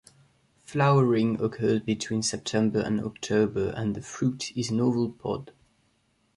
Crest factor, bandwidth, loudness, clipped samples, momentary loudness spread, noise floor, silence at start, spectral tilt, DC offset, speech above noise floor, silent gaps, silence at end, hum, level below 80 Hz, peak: 16 dB; 11.5 kHz; -27 LUFS; under 0.1%; 9 LU; -69 dBFS; 0.7 s; -6 dB/octave; under 0.1%; 43 dB; none; 0.85 s; none; -56 dBFS; -10 dBFS